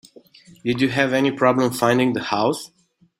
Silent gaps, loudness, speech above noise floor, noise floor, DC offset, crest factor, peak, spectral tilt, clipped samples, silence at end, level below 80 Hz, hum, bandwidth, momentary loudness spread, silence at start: none; -20 LUFS; 29 dB; -48 dBFS; under 0.1%; 20 dB; -2 dBFS; -5.5 dB/octave; under 0.1%; 0.55 s; -58 dBFS; none; 16 kHz; 10 LU; 0.65 s